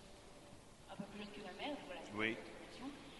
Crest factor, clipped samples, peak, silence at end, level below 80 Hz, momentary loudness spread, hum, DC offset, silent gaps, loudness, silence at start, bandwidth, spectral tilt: 26 dB; under 0.1%; -22 dBFS; 0 s; -68 dBFS; 18 LU; none; under 0.1%; none; -47 LUFS; 0 s; 11.5 kHz; -4.5 dB/octave